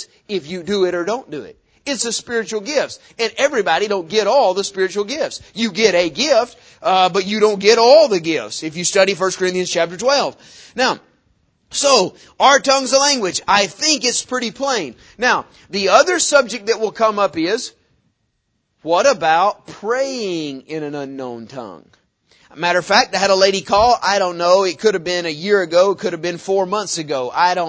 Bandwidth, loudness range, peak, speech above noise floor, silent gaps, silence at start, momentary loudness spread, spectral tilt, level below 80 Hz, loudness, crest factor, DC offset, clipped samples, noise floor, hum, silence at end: 8 kHz; 5 LU; 0 dBFS; 52 dB; none; 0 s; 13 LU; -2.5 dB/octave; -54 dBFS; -16 LUFS; 18 dB; under 0.1%; under 0.1%; -69 dBFS; none; 0 s